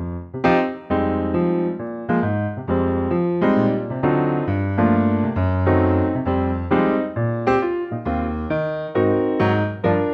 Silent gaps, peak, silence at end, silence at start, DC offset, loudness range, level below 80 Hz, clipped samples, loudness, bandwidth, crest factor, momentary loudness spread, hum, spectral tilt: none; -4 dBFS; 0 s; 0 s; under 0.1%; 2 LU; -40 dBFS; under 0.1%; -20 LUFS; 6.2 kHz; 16 dB; 6 LU; none; -10 dB/octave